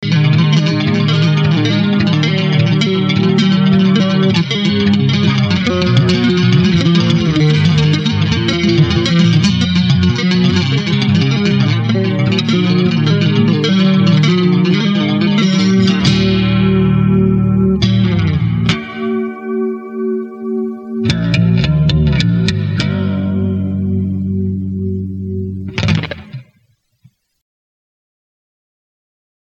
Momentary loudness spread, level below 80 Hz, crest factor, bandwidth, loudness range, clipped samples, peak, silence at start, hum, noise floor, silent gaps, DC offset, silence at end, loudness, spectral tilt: 8 LU; -34 dBFS; 12 dB; 8 kHz; 6 LU; under 0.1%; 0 dBFS; 0 s; none; -58 dBFS; none; under 0.1%; 3.05 s; -13 LUFS; -6.5 dB/octave